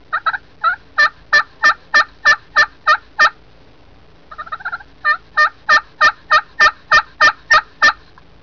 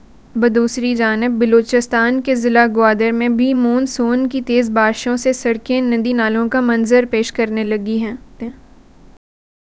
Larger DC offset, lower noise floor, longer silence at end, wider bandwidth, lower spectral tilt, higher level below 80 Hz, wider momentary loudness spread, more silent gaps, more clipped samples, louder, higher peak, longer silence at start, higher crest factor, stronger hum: first, 0.5% vs under 0.1%; first, -47 dBFS vs -43 dBFS; second, 0.5 s vs 1.25 s; second, 5.4 kHz vs 8 kHz; second, -0.5 dB/octave vs -4.5 dB/octave; about the same, -48 dBFS vs -48 dBFS; first, 11 LU vs 6 LU; neither; neither; about the same, -13 LUFS vs -15 LUFS; second, -6 dBFS vs 0 dBFS; second, 0.1 s vs 0.35 s; second, 10 dB vs 16 dB; neither